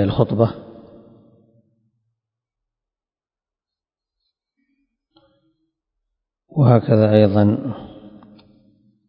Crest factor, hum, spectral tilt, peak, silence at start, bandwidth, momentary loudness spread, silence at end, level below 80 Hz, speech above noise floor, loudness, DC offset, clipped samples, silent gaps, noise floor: 22 dB; none; -11.5 dB/octave; 0 dBFS; 0 s; 5.4 kHz; 20 LU; 1.2 s; -48 dBFS; over 75 dB; -16 LUFS; under 0.1%; under 0.1%; none; under -90 dBFS